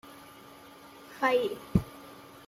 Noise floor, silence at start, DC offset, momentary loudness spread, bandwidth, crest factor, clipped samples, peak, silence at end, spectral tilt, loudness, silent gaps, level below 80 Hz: -51 dBFS; 0.05 s; under 0.1%; 23 LU; 16 kHz; 24 dB; under 0.1%; -10 dBFS; 0.25 s; -6.5 dB/octave; -29 LUFS; none; -50 dBFS